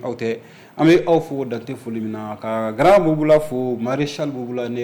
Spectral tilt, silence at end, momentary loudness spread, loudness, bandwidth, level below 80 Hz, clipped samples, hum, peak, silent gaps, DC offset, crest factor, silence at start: -7 dB/octave; 0 s; 14 LU; -19 LUFS; 19 kHz; -50 dBFS; under 0.1%; none; -6 dBFS; none; under 0.1%; 14 dB; 0 s